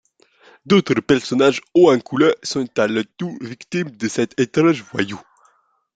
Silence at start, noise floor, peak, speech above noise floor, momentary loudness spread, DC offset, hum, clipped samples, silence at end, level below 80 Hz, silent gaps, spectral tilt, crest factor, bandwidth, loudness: 0.65 s; -60 dBFS; 0 dBFS; 42 dB; 12 LU; under 0.1%; none; under 0.1%; 0.75 s; -58 dBFS; none; -5.5 dB/octave; 18 dB; 9.2 kHz; -18 LUFS